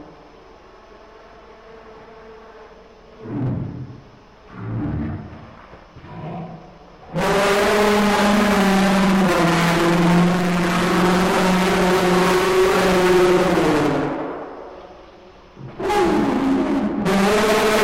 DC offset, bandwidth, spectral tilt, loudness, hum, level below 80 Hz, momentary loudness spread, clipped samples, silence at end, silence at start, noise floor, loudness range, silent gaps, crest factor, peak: under 0.1%; 16 kHz; -5.5 dB/octave; -17 LUFS; none; -40 dBFS; 18 LU; under 0.1%; 0 s; 0 s; -45 dBFS; 16 LU; none; 14 dB; -6 dBFS